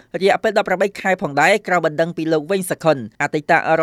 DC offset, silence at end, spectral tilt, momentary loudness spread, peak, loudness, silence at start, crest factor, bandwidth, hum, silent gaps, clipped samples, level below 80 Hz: under 0.1%; 0 s; -5 dB/octave; 6 LU; 0 dBFS; -18 LUFS; 0.15 s; 18 dB; 15.5 kHz; none; none; under 0.1%; -60 dBFS